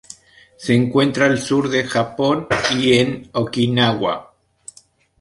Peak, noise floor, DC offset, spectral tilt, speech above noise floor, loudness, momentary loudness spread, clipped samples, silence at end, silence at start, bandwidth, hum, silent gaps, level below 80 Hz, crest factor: -2 dBFS; -52 dBFS; under 0.1%; -5 dB/octave; 35 dB; -18 LUFS; 8 LU; under 0.1%; 1 s; 0.1 s; 11.5 kHz; none; none; -52 dBFS; 18 dB